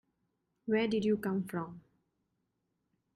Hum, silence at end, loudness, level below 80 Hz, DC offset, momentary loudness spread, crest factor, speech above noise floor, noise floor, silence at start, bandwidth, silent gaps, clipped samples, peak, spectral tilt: none; 1.35 s; -33 LUFS; -72 dBFS; under 0.1%; 14 LU; 16 dB; 50 dB; -82 dBFS; 0.65 s; 14.5 kHz; none; under 0.1%; -20 dBFS; -7 dB/octave